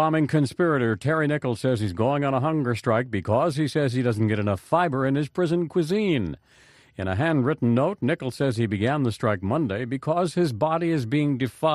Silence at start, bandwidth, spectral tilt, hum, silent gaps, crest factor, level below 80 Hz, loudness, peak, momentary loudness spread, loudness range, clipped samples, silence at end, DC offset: 0 s; 13 kHz; -7.5 dB/octave; none; none; 16 dB; -56 dBFS; -24 LUFS; -8 dBFS; 4 LU; 1 LU; under 0.1%; 0 s; under 0.1%